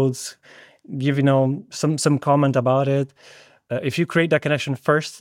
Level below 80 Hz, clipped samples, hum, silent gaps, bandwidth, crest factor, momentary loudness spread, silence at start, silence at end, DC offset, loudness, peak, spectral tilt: -68 dBFS; under 0.1%; none; none; 15 kHz; 16 dB; 11 LU; 0 s; 0.05 s; under 0.1%; -20 LUFS; -4 dBFS; -6 dB/octave